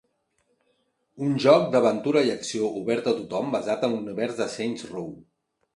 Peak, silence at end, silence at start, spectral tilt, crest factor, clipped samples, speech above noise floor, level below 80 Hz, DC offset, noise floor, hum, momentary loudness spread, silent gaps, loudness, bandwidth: -4 dBFS; 0.55 s; 1.15 s; -5.5 dB/octave; 20 dB; under 0.1%; 47 dB; -68 dBFS; under 0.1%; -71 dBFS; none; 12 LU; none; -24 LUFS; 11.5 kHz